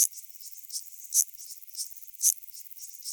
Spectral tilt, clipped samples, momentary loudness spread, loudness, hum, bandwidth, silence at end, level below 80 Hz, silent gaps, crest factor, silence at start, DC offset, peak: 8.5 dB/octave; under 0.1%; 16 LU; -29 LUFS; 50 Hz at -95 dBFS; over 20 kHz; 0 s; -84 dBFS; none; 26 dB; 0 s; under 0.1%; -6 dBFS